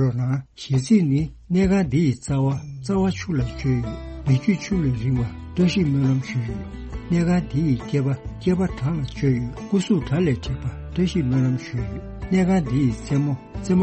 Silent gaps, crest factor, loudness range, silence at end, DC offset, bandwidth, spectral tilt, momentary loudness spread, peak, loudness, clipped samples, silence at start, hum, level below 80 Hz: none; 14 dB; 2 LU; 0 s; under 0.1%; 8.8 kHz; -7.5 dB/octave; 10 LU; -8 dBFS; -23 LUFS; under 0.1%; 0 s; none; -38 dBFS